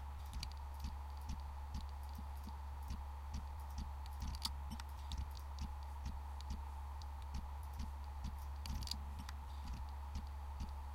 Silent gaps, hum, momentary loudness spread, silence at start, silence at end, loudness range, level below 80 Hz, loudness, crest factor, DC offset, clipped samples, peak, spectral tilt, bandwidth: none; none; 5 LU; 0 s; 0 s; 1 LU; -46 dBFS; -48 LUFS; 20 dB; under 0.1%; under 0.1%; -26 dBFS; -4.5 dB/octave; 16.5 kHz